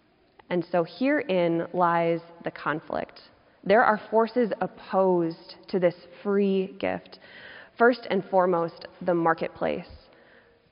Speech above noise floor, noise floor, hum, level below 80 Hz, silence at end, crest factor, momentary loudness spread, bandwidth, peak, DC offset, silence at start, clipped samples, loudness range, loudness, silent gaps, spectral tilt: 33 dB; -58 dBFS; none; -64 dBFS; 0.75 s; 20 dB; 14 LU; 5.4 kHz; -6 dBFS; under 0.1%; 0.5 s; under 0.1%; 2 LU; -26 LUFS; none; -5 dB/octave